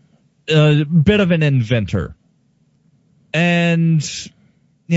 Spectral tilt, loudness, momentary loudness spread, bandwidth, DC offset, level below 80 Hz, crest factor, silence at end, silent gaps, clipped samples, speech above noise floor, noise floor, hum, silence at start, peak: -6.5 dB/octave; -16 LUFS; 15 LU; 8 kHz; under 0.1%; -42 dBFS; 16 dB; 0 s; none; under 0.1%; 44 dB; -59 dBFS; none; 0.5 s; -2 dBFS